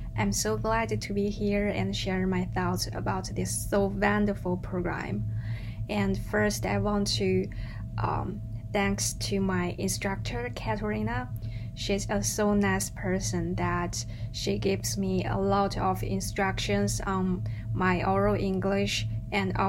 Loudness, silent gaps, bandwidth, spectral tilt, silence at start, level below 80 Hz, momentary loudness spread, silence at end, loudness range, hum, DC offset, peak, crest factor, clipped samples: -29 LUFS; none; 16 kHz; -5 dB/octave; 0 s; -40 dBFS; 7 LU; 0 s; 2 LU; none; under 0.1%; -12 dBFS; 18 dB; under 0.1%